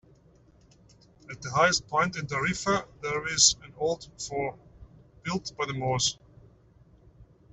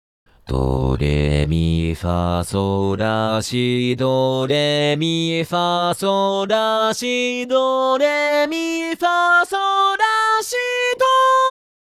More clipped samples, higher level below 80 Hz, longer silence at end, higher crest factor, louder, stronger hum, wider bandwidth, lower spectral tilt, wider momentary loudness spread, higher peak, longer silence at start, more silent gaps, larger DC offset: neither; second, -56 dBFS vs -34 dBFS; second, 0.3 s vs 0.5 s; first, 24 dB vs 14 dB; second, -27 LUFS vs -18 LUFS; neither; second, 8.2 kHz vs 15 kHz; second, -2 dB/octave vs -5 dB/octave; first, 15 LU vs 5 LU; about the same, -6 dBFS vs -4 dBFS; first, 1.3 s vs 0.45 s; neither; neither